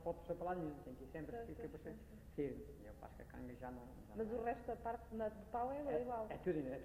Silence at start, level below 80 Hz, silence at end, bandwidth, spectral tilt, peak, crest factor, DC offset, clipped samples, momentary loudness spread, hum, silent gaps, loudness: 0 s; -60 dBFS; 0 s; 16 kHz; -8 dB/octave; -30 dBFS; 16 dB; under 0.1%; under 0.1%; 12 LU; none; none; -47 LUFS